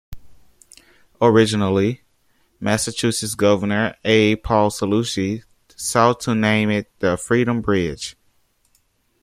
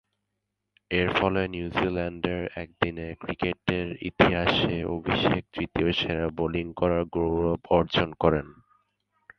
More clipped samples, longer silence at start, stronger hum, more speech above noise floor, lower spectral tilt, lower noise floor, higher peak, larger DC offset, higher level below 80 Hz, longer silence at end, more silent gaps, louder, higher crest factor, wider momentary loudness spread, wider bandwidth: neither; second, 0.1 s vs 0.9 s; neither; second, 45 dB vs 55 dB; second, -5 dB/octave vs -7.5 dB/octave; second, -63 dBFS vs -82 dBFS; about the same, -2 dBFS vs -2 dBFS; neither; about the same, -48 dBFS vs -44 dBFS; first, 1.1 s vs 0.85 s; neither; first, -19 LUFS vs -26 LUFS; second, 18 dB vs 26 dB; first, 10 LU vs 7 LU; first, 15 kHz vs 6.6 kHz